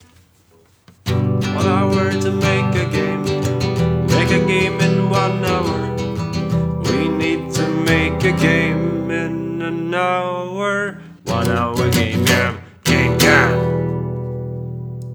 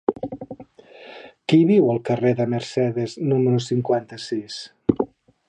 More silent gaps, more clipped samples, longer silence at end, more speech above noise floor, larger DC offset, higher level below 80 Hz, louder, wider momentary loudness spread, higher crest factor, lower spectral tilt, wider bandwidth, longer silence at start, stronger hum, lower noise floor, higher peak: neither; neither; second, 0 s vs 0.4 s; first, 36 dB vs 25 dB; neither; first, -38 dBFS vs -56 dBFS; first, -18 LUFS vs -21 LUFS; second, 8 LU vs 20 LU; about the same, 16 dB vs 20 dB; second, -5.5 dB/octave vs -7.5 dB/octave; first, over 20 kHz vs 9.8 kHz; first, 1.05 s vs 0.1 s; neither; first, -53 dBFS vs -45 dBFS; about the same, 0 dBFS vs -2 dBFS